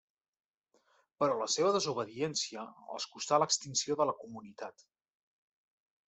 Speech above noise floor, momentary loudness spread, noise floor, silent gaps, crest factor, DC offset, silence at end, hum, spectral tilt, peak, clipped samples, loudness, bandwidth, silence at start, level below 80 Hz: 40 dB; 17 LU; -74 dBFS; none; 22 dB; under 0.1%; 1.4 s; none; -3 dB/octave; -14 dBFS; under 0.1%; -32 LUFS; 8.2 kHz; 1.2 s; -80 dBFS